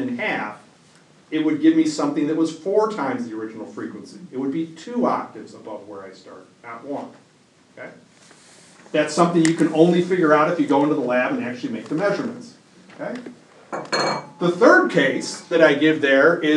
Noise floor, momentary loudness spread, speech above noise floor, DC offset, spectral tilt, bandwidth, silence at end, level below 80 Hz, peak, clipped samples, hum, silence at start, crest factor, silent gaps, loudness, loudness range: -55 dBFS; 22 LU; 35 dB; under 0.1%; -5.5 dB/octave; 11 kHz; 0 s; -76 dBFS; 0 dBFS; under 0.1%; none; 0 s; 20 dB; none; -19 LUFS; 11 LU